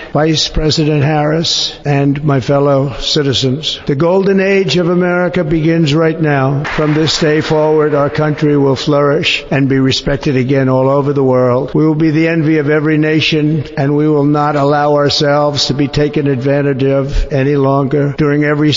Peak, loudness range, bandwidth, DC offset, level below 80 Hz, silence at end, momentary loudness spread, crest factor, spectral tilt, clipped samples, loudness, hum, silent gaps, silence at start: -2 dBFS; 1 LU; 7.6 kHz; 0.2%; -30 dBFS; 0 s; 3 LU; 8 dB; -6 dB/octave; under 0.1%; -12 LUFS; none; none; 0 s